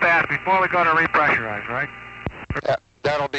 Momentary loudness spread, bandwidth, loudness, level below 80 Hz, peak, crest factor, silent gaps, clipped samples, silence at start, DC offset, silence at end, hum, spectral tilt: 13 LU; 8.2 kHz; -20 LUFS; -46 dBFS; -8 dBFS; 14 dB; none; under 0.1%; 0 s; under 0.1%; 0 s; none; -5.5 dB/octave